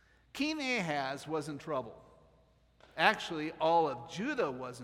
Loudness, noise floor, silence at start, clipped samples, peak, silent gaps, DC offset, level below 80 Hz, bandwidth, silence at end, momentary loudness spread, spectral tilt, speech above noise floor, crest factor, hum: -33 LUFS; -67 dBFS; 0.35 s; under 0.1%; -10 dBFS; none; under 0.1%; -70 dBFS; 15.5 kHz; 0 s; 10 LU; -4.5 dB/octave; 33 dB; 26 dB; none